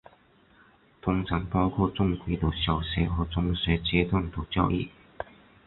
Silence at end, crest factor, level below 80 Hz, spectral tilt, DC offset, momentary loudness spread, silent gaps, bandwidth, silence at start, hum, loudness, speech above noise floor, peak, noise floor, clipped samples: 0.45 s; 20 dB; -38 dBFS; -11 dB/octave; under 0.1%; 12 LU; none; 4.3 kHz; 1.05 s; none; -28 LUFS; 33 dB; -8 dBFS; -60 dBFS; under 0.1%